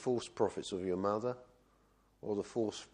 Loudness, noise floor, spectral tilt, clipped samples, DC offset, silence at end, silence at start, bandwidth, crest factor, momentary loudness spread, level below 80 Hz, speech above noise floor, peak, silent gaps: -37 LUFS; -70 dBFS; -5.5 dB/octave; under 0.1%; under 0.1%; 0.1 s; 0 s; 10.5 kHz; 20 dB; 7 LU; -72 dBFS; 33 dB; -16 dBFS; none